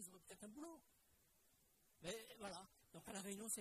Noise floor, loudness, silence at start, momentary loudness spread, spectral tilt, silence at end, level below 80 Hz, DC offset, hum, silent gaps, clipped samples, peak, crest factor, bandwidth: -78 dBFS; -54 LUFS; 0 s; 11 LU; -2.5 dB/octave; 0 s; -82 dBFS; under 0.1%; none; none; under 0.1%; -34 dBFS; 22 dB; 15 kHz